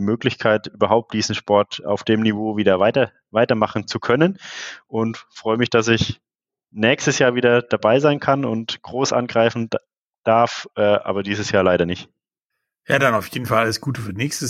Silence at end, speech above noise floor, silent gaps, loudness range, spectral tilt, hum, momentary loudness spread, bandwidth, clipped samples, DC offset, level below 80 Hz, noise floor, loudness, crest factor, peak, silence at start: 0 s; 61 dB; 9.97-10.23 s, 12.44-12.50 s; 3 LU; -5 dB/octave; none; 9 LU; 15.5 kHz; under 0.1%; under 0.1%; -56 dBFS; -80 dBFS; -19 LUFS; 18 dB; -2 dBFS; 0 s